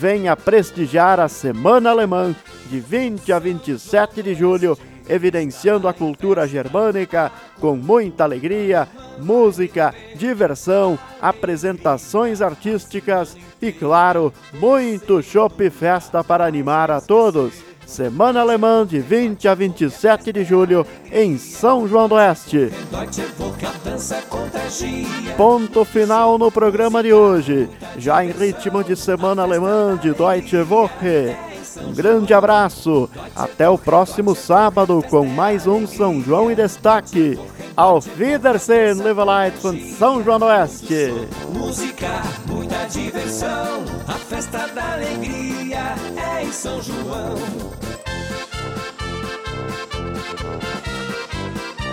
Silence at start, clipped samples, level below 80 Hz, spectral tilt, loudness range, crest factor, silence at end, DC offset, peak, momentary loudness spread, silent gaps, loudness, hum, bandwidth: 0 s; under 0.1%; -44 dBFS; -5.5 dB/octave; 9 LU; 18 dB; 0 s; under 0.1%; 0 dBFS; 13 LU; none; -17 LUFS; none; 16 kHz